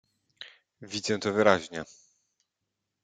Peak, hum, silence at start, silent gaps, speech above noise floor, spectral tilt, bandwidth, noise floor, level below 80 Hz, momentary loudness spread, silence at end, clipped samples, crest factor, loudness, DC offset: -4 dBFS; none; 0.4 s; none; 57 dB; -4 dB/octave; 9.4 kHz; -84 dBFS; -72 dBFS; 23 LU; 1.2 s; under 0.1%; 26 dB; -27 LUFS; under 0.1%